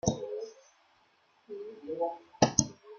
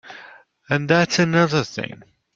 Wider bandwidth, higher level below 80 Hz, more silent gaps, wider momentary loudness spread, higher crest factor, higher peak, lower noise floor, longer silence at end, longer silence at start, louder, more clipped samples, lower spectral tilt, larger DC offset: first, 10.5 kHz vs 7.6 kHz; about the same, -58 dBFS vs -58 dBFS; neither; about the same, 19 LU vs 19 LU; first, 30 dB vs 20 dB; about the same, -4 dBFS vs -2 dBFS; first, -68 dBFS vs -46 dBFS; second, 0 s vs 0.4 s; about the same, 0.05 s vs 0.05 s; second, -32 LUFS vs -19 LUFS; neither; about the same, -4 dB/octave vs -5 dB/octave; neither